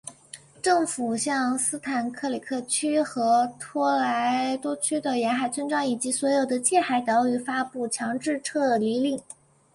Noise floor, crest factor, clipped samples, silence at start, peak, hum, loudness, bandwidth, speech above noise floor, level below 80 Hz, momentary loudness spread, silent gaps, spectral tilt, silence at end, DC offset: -48 dBFS; 16 dB; under 0.1%; 0.05 s; -8 dBFS; none; -25 LUFS; 11.5 kHz; 23 dB; -70 dBFS; 7 LU; none; -3 dB/octave; 0.4 s; under 0.1%